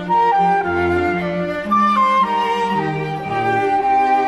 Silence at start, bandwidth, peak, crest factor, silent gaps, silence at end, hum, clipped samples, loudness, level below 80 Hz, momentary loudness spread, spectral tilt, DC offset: 0 s; 12 kHz; -6 dBFS; 10 dB; none; 0 s; none; under 0.1%; -17 LUFS; -48 dBFS; 7 LU; -6.5 dB/octave; under 0.1%